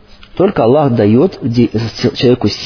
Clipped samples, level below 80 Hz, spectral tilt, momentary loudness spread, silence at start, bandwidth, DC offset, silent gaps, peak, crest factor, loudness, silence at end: under 0.1%; -40 dBFS; -7.5 dB/octave; 5 LU; 0.35 s; 5.4 kHz; under 0.1%; none; 0 dBFS; 12 dB; -12 LUFS; 0 s